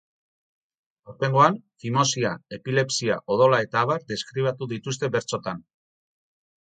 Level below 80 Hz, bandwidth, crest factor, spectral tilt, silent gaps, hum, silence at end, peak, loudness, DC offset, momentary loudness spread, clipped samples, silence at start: -66 dBFS; 9.4 kHz; 22 dB; -4.5 dB/octave; none; none; 1 s; -4 dBFS; -24 LUFS; under 0.1%; 12 LU; under 0.1%; 1.05 s